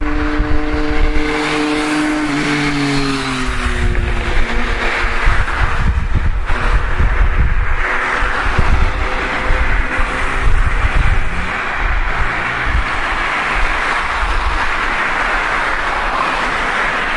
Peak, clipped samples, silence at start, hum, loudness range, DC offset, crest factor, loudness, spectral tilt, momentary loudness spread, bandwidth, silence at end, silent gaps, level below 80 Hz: 0 dBFS; under 0.1%; 0 s; none; 2 LU; under 0.1%; 14 dB; -17 LUFS; -5 dB/octave; 3 LU; 11.5 kHz; 0 s; none; -18 dBFS